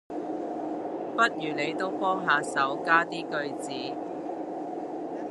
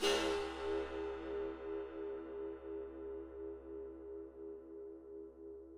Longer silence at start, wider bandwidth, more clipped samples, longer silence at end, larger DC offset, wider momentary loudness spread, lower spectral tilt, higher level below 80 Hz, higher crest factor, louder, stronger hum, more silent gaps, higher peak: about the same, 0.1 s vs 0 s; second, 11.5 kHz vs 13 kHz; neither; about the same, 0 s vs 0 s; neither; about the same, 11 LU vs 12 LU; about the same, -4 dB/octave vs -3 dB/octave; second, -78 dBFS vs -62 dBFS; about the same, 22 dB vs 22 dB; first, -29 LUFS vs -44 LUFS; neither; neither; first, -6 dBFS vs -22 dBFS